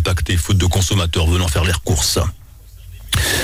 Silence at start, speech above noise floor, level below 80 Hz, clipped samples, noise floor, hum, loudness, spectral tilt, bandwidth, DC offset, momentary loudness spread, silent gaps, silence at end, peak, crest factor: 0 s; 23 dB; -24 dBFS; under 0.1%; -39 dBFS; none; -17 LUFS; -4 dB/octave; 16.5 kHz; under 0.1%; 4 LU; none; 0 s; -6 dBFS; 12 dB